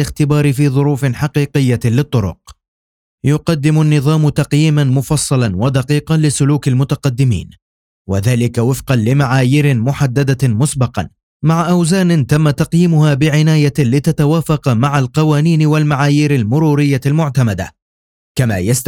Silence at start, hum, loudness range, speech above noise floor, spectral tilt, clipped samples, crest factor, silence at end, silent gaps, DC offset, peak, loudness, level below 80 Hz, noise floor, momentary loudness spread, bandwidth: 0 s; none; 3 LU; over 78 dB; -6.5 dB/octave; under 0.1%; 12 dB; 0 s; 2.68-3.18 s, 7.62-8.05 s, 11.23-11.40 s, 17.82-18.35 s; under 0.1%; 0 dBFS; -13 LUFS; -40 dBFS; under -90 dBFS; 5 LU; 16 kHz